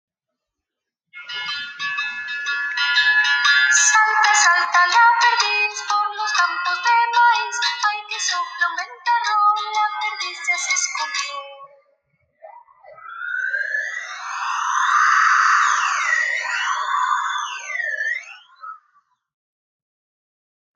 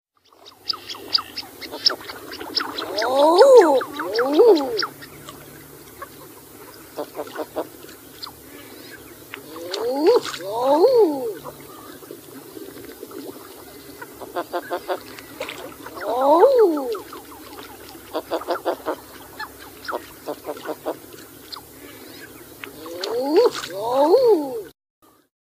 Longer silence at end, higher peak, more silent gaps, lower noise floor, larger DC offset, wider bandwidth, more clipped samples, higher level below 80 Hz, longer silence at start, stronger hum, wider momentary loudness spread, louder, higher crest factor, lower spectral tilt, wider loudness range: first, 2 s vs 0.75 s; second, -4 dBFS vs 0 dBFS; neither; first, -83 dBFS vs -50 dBFS; neither; second, 10 kHz vs 15.5 kHz; neither; second, -78 dBFS vs -62 dBFS; first, 1.15 s vs 0.45 s; neither; second, 13 LU vs 24 LU; about the same, -18 LUFS vs -20 LUFS; second, 16 dB vs 22 dB; second, 4 dB/octave vs -3.5 dB/octave; second, 11 LU vs 18 LU